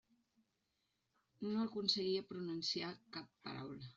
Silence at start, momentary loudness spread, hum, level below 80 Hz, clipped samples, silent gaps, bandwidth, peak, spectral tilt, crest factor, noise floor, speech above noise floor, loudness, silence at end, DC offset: 1.4 s; 13 LU; none; -82 dBFS; under 0.1%; none; 7.6 kHz; -22 dBFS; -3.5 dB/octave; 22 dB; -85 dBFS; 43 dB; -41 LUFS; 0.05 s; under 0.1%